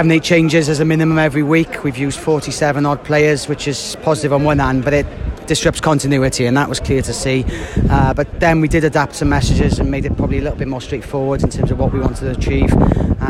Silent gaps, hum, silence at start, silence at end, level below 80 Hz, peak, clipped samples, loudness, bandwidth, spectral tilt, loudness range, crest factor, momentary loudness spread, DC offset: none; none; 0 s; 0 s; -26 dBFS; 0 dBFS; under 0.1%; -16 LUFS; 13.5 kHz; -6 dB/octave; 2 LU; 14 dB; 7 LU; under 0.1%